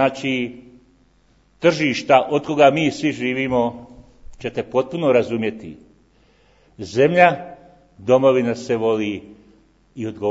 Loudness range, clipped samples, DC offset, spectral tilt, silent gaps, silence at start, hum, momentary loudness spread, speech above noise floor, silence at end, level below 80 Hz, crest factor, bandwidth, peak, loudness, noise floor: 4 LU; under 0.1%; under 0.1%; -6 dB/octave; none; 0 s; none; 17 LU; 39 dB; 0 s; -54 dBFS; 20 dB; 8 kHz; 0 dBFS; -19 LUFS; -57 dBFS